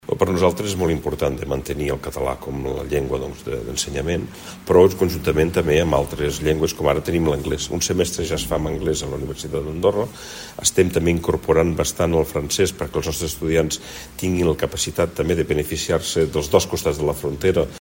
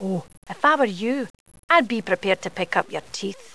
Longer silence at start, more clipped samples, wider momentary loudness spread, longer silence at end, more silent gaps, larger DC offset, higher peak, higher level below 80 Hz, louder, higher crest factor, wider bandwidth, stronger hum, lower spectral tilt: about the same, 0.05 s vs 0 s; neither; second, 9 LU vs 12 LU; second, 0 s vs 0.2 s; second, none vs 0.37-0.42 s, 1.30-1.46 s, 1.59-1.68 s; second, under 0.1% vs 0.4%; about the same, 0 dBFS vs -2 dBFS; first, -36 dBFS vs -66 dBFS; about the same, -21 LUFS vs -23 LUFS; about the same, 20 dB vs 22 dB; first, 16.5 kHz vs 11 kHz; neither; about the same, -4.5 dB/octave vs -4.5 dB/octave